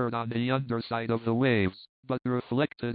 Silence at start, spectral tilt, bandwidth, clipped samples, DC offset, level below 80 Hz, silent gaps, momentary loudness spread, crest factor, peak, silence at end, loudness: 0 s; -11 dB/octave; 5 kHz; under 0.1%; under 0.1%; -62 dBFS; 1.89-2.03 s; 6 LU; 16 dB; -12 dBFS; 0 s; -29 LUFS